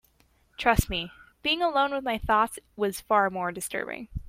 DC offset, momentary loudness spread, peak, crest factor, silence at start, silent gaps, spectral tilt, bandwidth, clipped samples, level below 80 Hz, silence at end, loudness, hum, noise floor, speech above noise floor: under 0.1%; 8 LU; -4 dBFS; 24 dB; 0.6 s; none; -4 dB/octave; 16.5 kHz; under 0.1%; -42 dBFS; 0 s; -27 LUFS; none; -65 dBFS; 38 dB